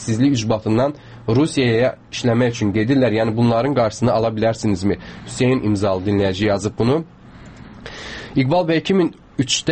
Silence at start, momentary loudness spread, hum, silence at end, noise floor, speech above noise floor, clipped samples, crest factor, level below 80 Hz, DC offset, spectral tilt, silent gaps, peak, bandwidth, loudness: 0 s; 9 LU; none; 0 s; -40 dBFS; 22 dB; under 0.1%; 14 dB; -46 dBFS; under 0.1%; -6 dB/octave; none; -4 dBFS; 8.8 kHz; -18 LUFS